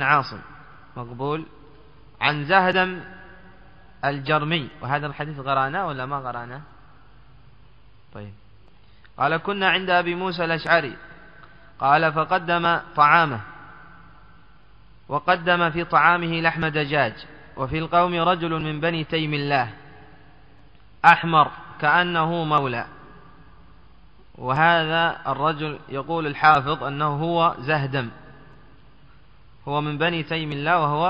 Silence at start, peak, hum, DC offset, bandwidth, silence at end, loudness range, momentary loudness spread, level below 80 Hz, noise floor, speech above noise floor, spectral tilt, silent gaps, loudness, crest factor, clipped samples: 0 s; 0 dBFS; none; 0.4%; 7.6 kHz; 0 s; 6 LU; 16 LU; -54 dBFS; -53 dBFS; 32 dB; -3 dB/octave; none; -21 LUFS; 24 dB; under 0.1%